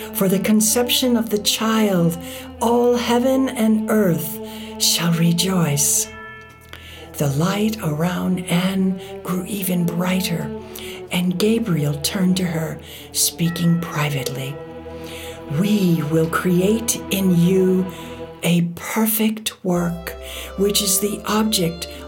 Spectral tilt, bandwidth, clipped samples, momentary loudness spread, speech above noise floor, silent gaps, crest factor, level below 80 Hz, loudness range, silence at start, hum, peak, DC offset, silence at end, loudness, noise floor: -4.5 dB/octave; 18 kHz; under 0.1%; 15 LU; 21 dB; none; 16 dB; -46 dBFS; 4 LU; 0 s; none; -4 dBFS; under 0.1%; 0 s; -19 LUFS; -40 dBFS